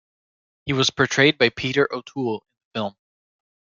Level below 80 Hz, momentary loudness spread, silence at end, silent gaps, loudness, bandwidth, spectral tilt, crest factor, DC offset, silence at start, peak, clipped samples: -60 dBFS; 16 LU; 0.7 s; 2.65-2.71 s; -21 LUFS; 7.8 kHz; -4 dB/octave; 20 dB; under 0.1%; 0.65 s; -2 dBFS; under 0.1%